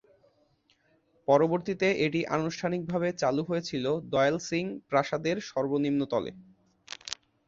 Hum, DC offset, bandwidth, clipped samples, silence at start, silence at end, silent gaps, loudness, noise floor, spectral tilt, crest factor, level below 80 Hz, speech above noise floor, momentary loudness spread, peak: none; under 0.1%; 7.8 kHz; under 0.1%; 1.3 s; 0.35 s; none; -29 LUFS; -68 dBFS; -5.5 dB/octave; 20 dB; -66 dBFS; 40 dB; 12 LU; -10 dBFS